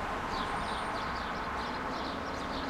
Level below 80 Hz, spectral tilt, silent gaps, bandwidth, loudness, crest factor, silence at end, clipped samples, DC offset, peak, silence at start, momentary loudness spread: -48 dBFS; -4.5 dB/octave; none; 16.5 kHz; -35 LUFS; 14 dB; 0 s; under 0.1%; under 0.1%; -22 dBFS; 0 s; 2 LU